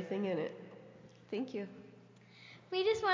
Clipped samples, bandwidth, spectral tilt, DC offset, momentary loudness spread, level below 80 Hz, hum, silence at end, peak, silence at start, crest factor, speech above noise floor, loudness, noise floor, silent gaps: under 0.1%; 7.6 kHz; -5.5 dB/octave; under 0.1%; 24 LU; -76 dBFS; none; 0 s; -20 dBFS; 0 s; 18 dB; 24 dB; -38 LUFS; -60 dBFS; none